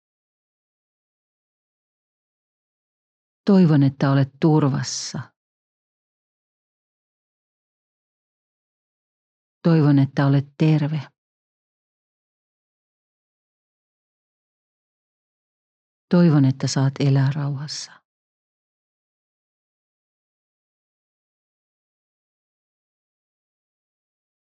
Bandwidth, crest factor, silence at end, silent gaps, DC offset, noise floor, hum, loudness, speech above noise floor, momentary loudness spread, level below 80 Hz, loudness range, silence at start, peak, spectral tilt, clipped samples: 8.4 kHz; 20 dB; 6.7 s; 5.36-9.61 s, 11.18-16.08 s; under 0.1%; under -90 dBFS; none; -19 LUFS; over 72 dB; 13 LU; -76 dBFS; 10 LU; 3.45 s; -6 dBFS; -7 dB/octave; under 0.1%